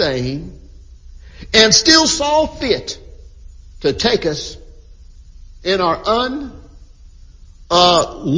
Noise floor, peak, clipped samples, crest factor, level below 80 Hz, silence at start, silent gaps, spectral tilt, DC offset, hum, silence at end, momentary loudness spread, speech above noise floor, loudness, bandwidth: -41 dBFS; 0 dBFS; under 0.1%; 18 dB; -38 dBFS; 0 s; none; -2.5 dB/octave; under 0.1%; none; 0 s; 20 LU; 25 dB; -14 LUFS; 7.8 kHz